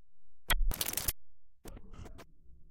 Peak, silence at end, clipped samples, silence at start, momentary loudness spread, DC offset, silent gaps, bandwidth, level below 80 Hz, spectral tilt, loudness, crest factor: -14 dBFS; 0 s; under 0.1%; 0 s; 22 LU; under 0.1%; none; 17 kHz; -40 dBFS; -1.5 dB/octave; -34 LUFS; 22 dB